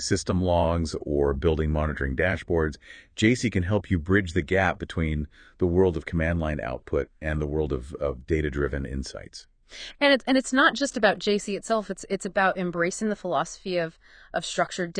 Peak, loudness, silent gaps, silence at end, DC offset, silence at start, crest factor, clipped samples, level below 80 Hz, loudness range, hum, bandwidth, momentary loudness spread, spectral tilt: -6 dBFS; -26 LUFS; none; 0 s; under 0.1%; 0 s; 20 dB; under 0.1%; -38 dBFS; 4 LU; none; 9.8 kHz; 10 LU; -5.5 dB/octave